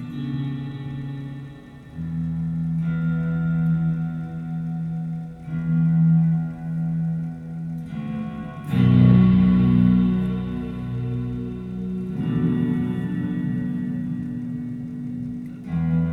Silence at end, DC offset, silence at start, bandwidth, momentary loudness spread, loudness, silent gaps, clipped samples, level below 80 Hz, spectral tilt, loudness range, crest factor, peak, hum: 0 s; under 0.1%; 0 s; 4.2 kHz; 15 LU; -23 LUFS; none; under 0.1%; -42 dBFS; -10.5 dB/octave; 8 LU; 16 dB; -6 dBFS; none